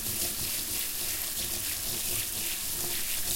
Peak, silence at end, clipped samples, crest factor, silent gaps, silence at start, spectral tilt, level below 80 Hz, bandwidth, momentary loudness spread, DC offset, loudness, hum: -14 dBFS; 0 s; under 0.1%; 18 dB; none; 0 s; -0.5 dB/octave; -50 dBFS; 16.5 kHz; 1 LU; under 0.1%; -29 LUFS; none